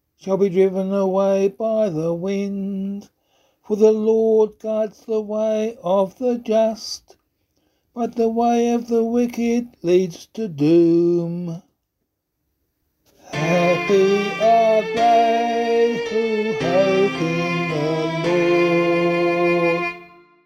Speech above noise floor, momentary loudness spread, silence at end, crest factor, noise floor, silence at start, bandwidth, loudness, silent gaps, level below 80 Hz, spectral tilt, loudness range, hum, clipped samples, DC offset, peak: 57 dB; 11 LU; 0.4 s; 16 dB; -76 dBFS; 0.25 s; 13 kHz; -19 LUFS; none; -60 dBFS; -6.5 dB/octave; 5 LU; none; under 0.1%; under 0.1%; -4 dBFS